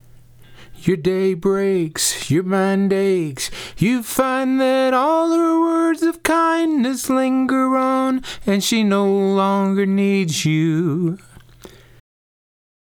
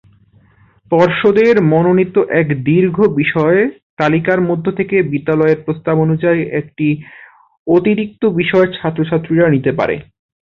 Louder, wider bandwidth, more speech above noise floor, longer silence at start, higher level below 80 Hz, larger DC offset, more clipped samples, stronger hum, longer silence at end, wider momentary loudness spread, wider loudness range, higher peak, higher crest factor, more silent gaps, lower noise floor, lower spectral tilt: second, -18 LUFS vs -14 LUFS; first, over 20 kHz vs 6.8 kHz; second, 27 dB vs 37 dB; second, 0.5 s vs 0.9 s; about the same, -50 dBFS vs -50 dBFS; neither; neither; neither; first, 1.3 s vs 0.45 s; about the same, 5 LU vs 7 LU; about the same, 2 LU vs 3 LU; about the same, 0 dBFS vs 0 dBFS; about the same, 18 dB vs 14 dB; second, none vs 3.82-3.97 s, 7.59-7.66 s; second, -44 dBFS vs -50 dBFS; second, -5 dB/octave vs -9 dB/octave